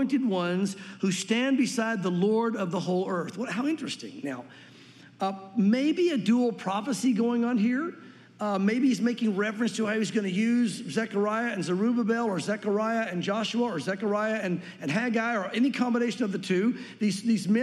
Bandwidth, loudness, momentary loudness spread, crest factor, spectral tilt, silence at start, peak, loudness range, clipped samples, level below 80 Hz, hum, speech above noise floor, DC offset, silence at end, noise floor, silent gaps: 12 kHz; -27 LUFS; 7 LU; 14 dB; -5.5 dB/octave; 0 s; -12 dBFS; 3 LU; under 0.1%; -84 dBFS; none; 25 dB; under 0.1%; 0 s; -51 dBFS; none